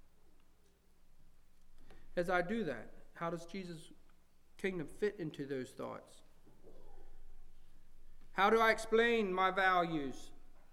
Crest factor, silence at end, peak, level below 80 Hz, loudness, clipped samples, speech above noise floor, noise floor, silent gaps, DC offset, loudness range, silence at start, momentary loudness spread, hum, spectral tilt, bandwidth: 20 dB; 0.05 s; -18 dBFS; -54 dBFS; -36 LUFS; under 0.1%; 30 dB; -65 dBFS; none; under 0.1%; 11 LU; 0.25 s; 17 LU; none; -5 dB/octave; 14.5 kHz